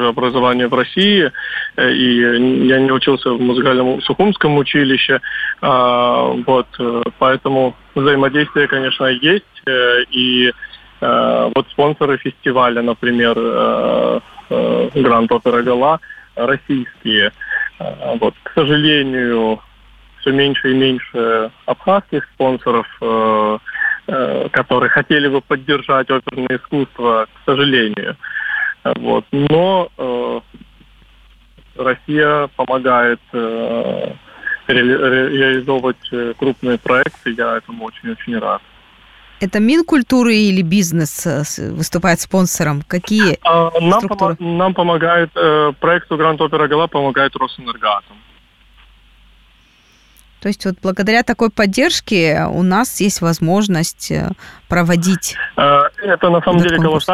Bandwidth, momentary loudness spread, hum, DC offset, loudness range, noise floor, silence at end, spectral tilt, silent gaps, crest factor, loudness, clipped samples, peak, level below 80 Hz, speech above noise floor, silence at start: 15.5 kHz; 8 LU; none; under 0.1%; 4 LU; -50 dBFS; 0 s; -5 dB/octave; none; 14 dB; -15 LUFS; under 0.1%; -2 dBFS; -46 dBFS; 36 dB; 0 s